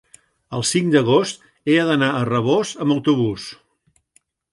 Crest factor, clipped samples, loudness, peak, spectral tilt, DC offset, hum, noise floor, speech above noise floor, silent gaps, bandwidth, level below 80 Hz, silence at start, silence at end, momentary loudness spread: 18 dB; under 0.1%; -19 LUFS; -2 dBFS; -5 dB/octave; under 0.1%; none; -64 dBFS; 46 dB; none; 11.5 kHz; -58 dBFS; 0.5 s; 1 s; 12 LU